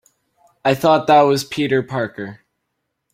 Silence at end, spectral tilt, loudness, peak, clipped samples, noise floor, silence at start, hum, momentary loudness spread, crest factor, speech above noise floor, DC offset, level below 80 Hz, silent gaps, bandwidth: 0.8 s; -5.5 dB/octave; -17 LUFS; -2 dBFS; under 0.1%; -75 dBFS; 0.65 s; none; 14 LU; 18 dB; 59 dB; under 0.1%; -58 dBFS; none; 16 kHz